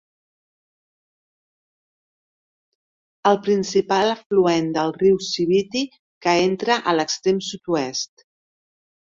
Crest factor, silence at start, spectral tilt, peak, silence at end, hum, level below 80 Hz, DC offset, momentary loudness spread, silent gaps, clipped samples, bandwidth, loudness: 20 dB; 3.25 s; -4.5 dB/octave; -4 dBFS; 1.1 s; none; -62 dBFS; under 0.1%; 8 LU; 4.26-4.30 s, 5.99-6.21 s; under 0.1%; 7.6 kHz; -20 LUFS